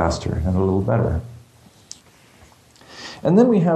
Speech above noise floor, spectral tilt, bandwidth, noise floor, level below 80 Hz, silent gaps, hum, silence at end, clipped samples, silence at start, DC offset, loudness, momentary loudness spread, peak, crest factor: 33 dB; -7.5 dB/octave; 12 kHz; -50 dBFS; -36 dBFS; none; none; 0 s; under 0.1%; 0 s; under 0.1%; -19 LUFS; 26 LU; -4 dBFS; 18 dB